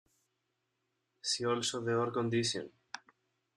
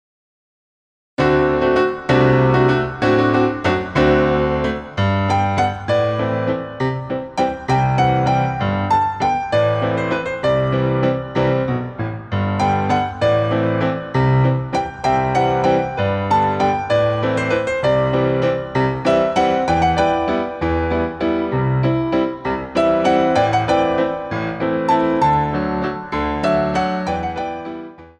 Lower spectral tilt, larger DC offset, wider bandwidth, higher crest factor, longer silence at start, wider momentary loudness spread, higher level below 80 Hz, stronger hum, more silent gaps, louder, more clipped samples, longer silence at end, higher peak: second, -4 dB/octave vs -7 dB/octave; neither; first, 12.5 kHz vs 9.4 kHz; about the same, 18 dB vs 16 dB; about the same, 1.25 s vs 1.2 s; first, 17 LU vs 7 LU; second, -76 dBFS vs -38 dBFS; neither; neither; second, -34 LUFS vs -18 LUFS; neither; first, 0.6 s vs 0.1 s; second, -20 dBFS vs -2 dBFS